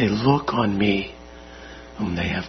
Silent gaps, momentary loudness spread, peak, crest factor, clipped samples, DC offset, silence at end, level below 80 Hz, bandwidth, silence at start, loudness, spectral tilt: none; 21 LU; -4 dBFS; 20 dB; under 0.1%; under 0.1%; 0 s; -46 dBFS; 6.4 kHz; 0 s; -22 LUFS; -7 dB/octave